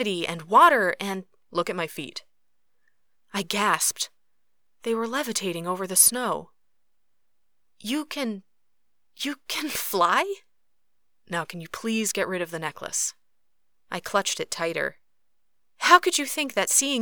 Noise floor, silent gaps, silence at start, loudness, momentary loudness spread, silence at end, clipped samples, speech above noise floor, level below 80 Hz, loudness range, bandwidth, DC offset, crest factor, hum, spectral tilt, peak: -81 dBFS; none; 0 s; -24 LUFS; 16 LU; 0 s; under 0.1%; 56 dB; -72 dBFS; 6 LU; over 20 kHz; 0.1%; 26 dB; none; -2 dB/octave; -2 dBFS